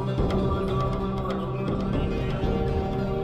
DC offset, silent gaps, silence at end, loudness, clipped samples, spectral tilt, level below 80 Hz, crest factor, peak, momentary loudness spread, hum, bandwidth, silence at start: under 0.1%; none; 0 s; -27 LUFS; under 0.1%; -8.5 dB/octave; -34 dBFS; 14 dB; -12 dBFS; 3 LU; none; 9.2 kHz; 0 s